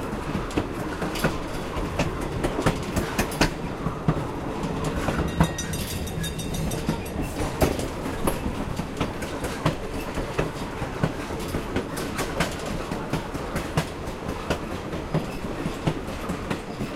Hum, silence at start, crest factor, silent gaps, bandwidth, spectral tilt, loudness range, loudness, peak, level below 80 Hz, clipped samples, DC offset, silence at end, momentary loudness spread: none; 0 s; 22 dB; none; 16 kHz; -5.5 dB/octave; 3 LU; -28 LUFS; -4 dBFS; -36 dBFS; under 0.1%; under 0.1%; 0 s; 6 LU